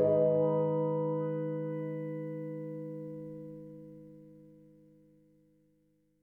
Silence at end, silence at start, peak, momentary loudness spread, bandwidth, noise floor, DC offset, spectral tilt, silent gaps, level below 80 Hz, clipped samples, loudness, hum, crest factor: 1.65 s; 0 s; -18 dBFS; 23 LU; 3.2 kHz; -72 dBFS; under 0.1%; -11.5 dB/octave; none; -76 dBFS; under 0.1%; -34 LUFS; 50 Hz at -85 dBFS; 18 dB